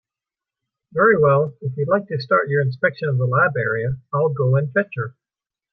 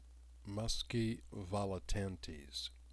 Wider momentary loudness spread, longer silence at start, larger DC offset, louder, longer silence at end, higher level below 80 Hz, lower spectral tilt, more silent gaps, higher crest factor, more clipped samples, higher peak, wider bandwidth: about the same, 10 LU vs 10 LU; first, 0.95 s vs 0 s; neither; first, -19 LUFS vs -42 LUFS; first, 0.65 s vs 0 s; second, -58 dBFS vs -50 dBFS; first, -10.5 dB/octave vs -5 dB/octave; neither; about the same, 16 dB vs 18 dB; neither; first, -4 dBFS vs -24 dBFS; second, 4.9 kHz vs 11 kHz